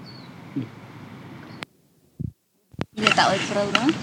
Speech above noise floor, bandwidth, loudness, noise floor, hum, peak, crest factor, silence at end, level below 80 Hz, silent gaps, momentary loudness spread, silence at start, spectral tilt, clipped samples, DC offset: 38 dB; 16.5 kHz; -22 LUFS; -60 dBFS; none; -2 dBFS; 24 dB; 0 s; -56 dBFS; none; 23 LU; 0 s; -4 dB/octave; under 0.1%; under 0.1%